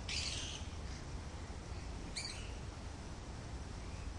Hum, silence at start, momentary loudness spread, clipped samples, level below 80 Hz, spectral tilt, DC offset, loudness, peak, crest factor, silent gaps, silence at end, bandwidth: none; 0 s; 9 LU; under 0.1%; -50 dBFS; -3.5 dB/octave; under 0.1%; -45 LUFS; -26 dBFS; 18 dB; none; 0 s; 11.5 kHz